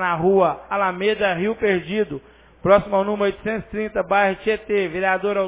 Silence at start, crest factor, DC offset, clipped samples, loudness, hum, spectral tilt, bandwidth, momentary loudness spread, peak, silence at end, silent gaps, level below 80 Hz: 0 s; 18 dB; under 0.1%; under 0.1%; -20 LUFS; none; -9.5 dB/octave; 4 kHz; 9 LU; -4 dBFS; 0 s; none; -48 dBFS